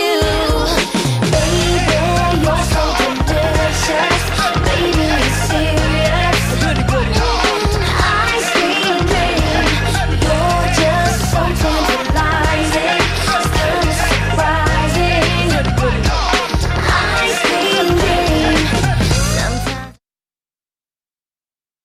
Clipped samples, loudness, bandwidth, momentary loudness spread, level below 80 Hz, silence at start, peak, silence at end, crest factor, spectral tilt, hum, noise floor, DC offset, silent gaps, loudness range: under 0.1%; -14 LUFS; 16 kHz; 2 LU; -22 dBFS; 0 s; -2 dBFS; 1.9 s; 12 dB; -4.5 dB/octave; none; under -90 dBFS; under 0.1%; none; 1 LU